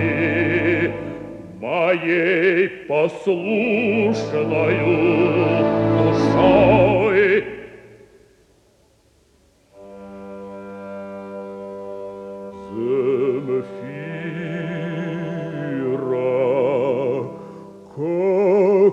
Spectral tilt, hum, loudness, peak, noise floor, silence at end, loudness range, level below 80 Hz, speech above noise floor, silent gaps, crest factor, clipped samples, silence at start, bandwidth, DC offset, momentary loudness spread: -7.5 dB/octave; none; -19 LUFS; -2 dBFS; -57 dBFS; 0 s; 18 LU; -50 dBFS; 41 dB; none; 18 dB; under 0.1%; 0 s; 8.2 kHz; under 0.1%; 19 LU